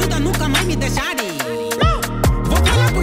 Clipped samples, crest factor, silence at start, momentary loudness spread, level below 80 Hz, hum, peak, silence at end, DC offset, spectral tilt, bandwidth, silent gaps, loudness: under 0.1%; 14 dB; 0 s; 7 LU; -22 dBFS; none; -2 dBFS; 0 s; under 0.1%; -4.5 dB/octave; 16.5 kHz; none; -18 LUFS